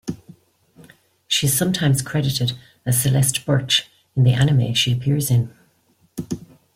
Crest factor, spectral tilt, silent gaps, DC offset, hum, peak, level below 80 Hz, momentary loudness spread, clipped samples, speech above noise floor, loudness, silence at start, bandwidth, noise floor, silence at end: 20 dB; -4.5 dB/octave; none; under 0.1%; none; 0 dBFS; -50 dBFS; 15 LU; under 0.1%; 42 dB; -19 LUFS; 0.05 s; 16.5 kHz; -61 dBFS; 0.3 s